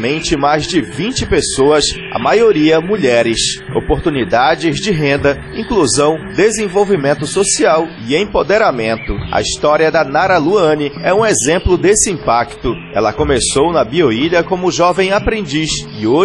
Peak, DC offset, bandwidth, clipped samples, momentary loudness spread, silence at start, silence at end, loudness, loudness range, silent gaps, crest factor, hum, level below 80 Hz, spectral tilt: 0 dBFS; under 0.1%; 11.5 kHz; under 0.1%; 6 LU; 0 s; 0 s; -13 LUFS; 1 LU; none; 12 dB; none; -32 dBFS; -4 dB/octave